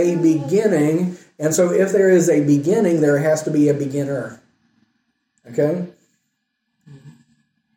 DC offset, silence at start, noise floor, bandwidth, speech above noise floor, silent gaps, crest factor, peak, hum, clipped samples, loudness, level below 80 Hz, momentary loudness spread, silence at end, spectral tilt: under 0.1%; 0 s; -73 dBFS; 16.5 kHz; 57 dB; none; 14 dB; -4 dBFS; none; under 0.1%; -18 LUFS; -66 dBFS; 12 LU; 0.65 s; -6.5 dB/octave